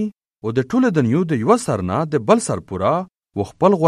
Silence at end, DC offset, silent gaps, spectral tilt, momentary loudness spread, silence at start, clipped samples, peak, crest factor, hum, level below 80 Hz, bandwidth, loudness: 0 s; under 0.1%; none; -6.5 dB/octave; 11 LU; 0 s; under 0.1%; 0 dBFS; 18 dB; none; -52 dBFS; 12.5 kHz; -19 LUFS